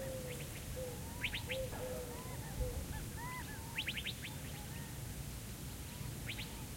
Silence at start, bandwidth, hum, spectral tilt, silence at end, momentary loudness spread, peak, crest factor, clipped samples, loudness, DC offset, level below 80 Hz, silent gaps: 0 s; 16.5 kHz; none; -4 dB/octave; 0 s; 6 LU; -26 dBFS; 18 dB; under 0.1%; -44 LUFS; under 0.1%; -52 dBFS; none